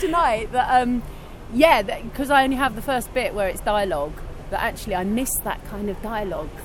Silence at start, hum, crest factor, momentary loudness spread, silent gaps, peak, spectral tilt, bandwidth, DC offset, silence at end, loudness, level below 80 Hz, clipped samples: 0 s; none; 20 dB; 12 LU; none; -2 dBFS; -4 dB/octave; 17.5 kHz; under 0.1%; 0 s; -22 LUFS; -36 dBFS; under 0.1%